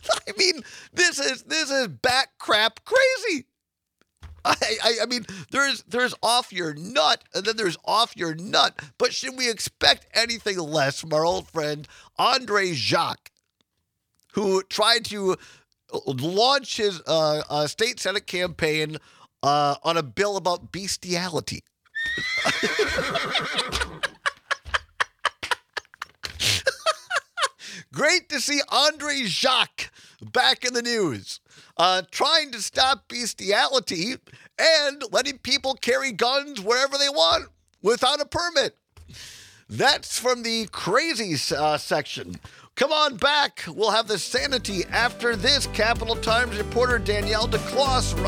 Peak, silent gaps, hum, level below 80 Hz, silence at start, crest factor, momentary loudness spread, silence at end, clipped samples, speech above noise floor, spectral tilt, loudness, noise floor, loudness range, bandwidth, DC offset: 0 dBFS; none; none; -46 dBFS; 0.05 s; 24 dB; 10 LU; 0 s; under 0.1%; 59 dB; -2.5 dB/octave; -23 LUFS; -83 dBFS; 4 LU; 18.5 kHz; under 0.1%